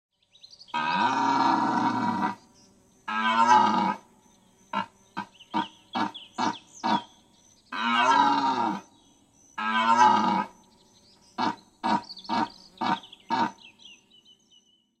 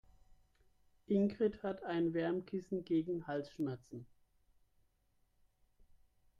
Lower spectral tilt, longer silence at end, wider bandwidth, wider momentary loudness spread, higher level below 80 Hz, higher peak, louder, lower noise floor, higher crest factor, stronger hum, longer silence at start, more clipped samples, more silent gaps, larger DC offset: second, -4 dB/octave vs -8.5 dB/octave; second, 1.05 s vs 2.35 s; first, 9.4 kHz vs 7.2 kHz; first, 18 LU vs 8 LU; about the same, -74 dBFS vs -72 dBFS; first, -6 dBFS vs -22 dBFS; first, -26 LUFS vs -38 LUFS; second, -62 dBFS vs -76 dBFS; about the same, 20 dB vs 18 dB; neither; second, 0.75 s vs 1.1 s; neither; neither; neither